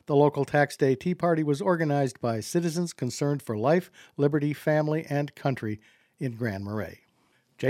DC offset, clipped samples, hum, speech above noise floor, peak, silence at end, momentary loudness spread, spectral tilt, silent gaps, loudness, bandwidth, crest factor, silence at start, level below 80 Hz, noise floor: under 0.1%; under 0.1%; none; 41 dB; -8 dBFS; 0 s; 11 LU; -6.5 dB/octave; none; -27 LUFS; 15.5 kHz; 20 dB; 0.1 s; -68 dBFS; -67 dBFS